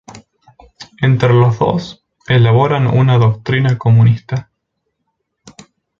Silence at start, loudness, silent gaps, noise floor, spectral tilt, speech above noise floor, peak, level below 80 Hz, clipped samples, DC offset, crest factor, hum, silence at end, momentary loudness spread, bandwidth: 0.15 s; -13 LUFS; none; -71 dBFS; -8 dB/octave; 60 dB; 0 dBFS; -44 dBFS; under 0.1%; under 0.1%; 14 dB; none; 0.5 s; 10 LU; 7.2 kHz